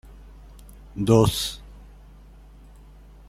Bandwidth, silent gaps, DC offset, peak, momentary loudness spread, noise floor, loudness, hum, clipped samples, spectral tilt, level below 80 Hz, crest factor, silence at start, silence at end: 16 kHz; none; under 0.1%; -4 dBFS; 22 LU; -47 dBFS; -21 LUFS; 50 Hz at -45 dBFS; under 0.1%; -6 dB/octave; -42 dBFS; 24 dB; 0.95 s; 1.5 s